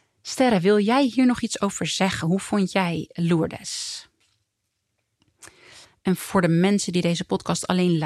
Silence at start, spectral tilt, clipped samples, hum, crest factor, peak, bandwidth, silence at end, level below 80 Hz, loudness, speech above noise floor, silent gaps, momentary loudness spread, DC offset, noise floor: 0.25 s; -5 dB/octave; under 0.1%; none; 18 dB; -6 dBFS; 13.5 kHz; 0 s; -58 dBFS; -22 LUFS; 55 dB; none; 10 LU; under 0.1%; -77 dBFS